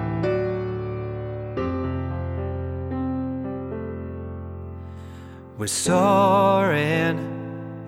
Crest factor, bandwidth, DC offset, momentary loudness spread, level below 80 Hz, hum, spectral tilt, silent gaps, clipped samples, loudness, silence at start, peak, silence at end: 18 dB; 17 kHz; under 0.1%; 18 LU; -44 dBFS; none; -5.5 dB/octave; none; under 0.1%; -24 LUFS; 0 s; -6 dBFS; 0 s